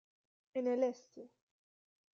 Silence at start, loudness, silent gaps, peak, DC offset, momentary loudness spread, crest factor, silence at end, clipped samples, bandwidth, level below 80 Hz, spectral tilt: 0.55 s; -37 LUFS; none; -22 dBFS; under 0.1%; 22 LU; 20 dB; 0.9 s; under 0.1%; 7.2 kHz; under -90 dBFS; -5.5 dB/octave